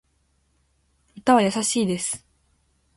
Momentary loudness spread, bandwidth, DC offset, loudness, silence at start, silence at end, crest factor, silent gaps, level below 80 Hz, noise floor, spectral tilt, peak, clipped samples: 10 LU; 11.5 kHz; under 0.1%; -22 LUFS; 1.15 s; 0.8 s; 20 dB; none; -62 dBFS; -67 dBFS; -4 dB/octave; -4 dBFS; under 0.1%